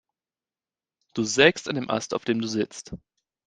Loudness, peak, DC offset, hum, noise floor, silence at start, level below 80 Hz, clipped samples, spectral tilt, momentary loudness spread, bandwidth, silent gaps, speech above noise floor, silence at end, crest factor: -24 LUFS; -2 dBFS; under 0.1%; none; under -90 dBFS; 1.15 s; -60 dBFS; under 0.1%; -3.5 dB/octave; 20 LU; 9.8 kHz; none; over 65 dB; 0.5 s; 26 dB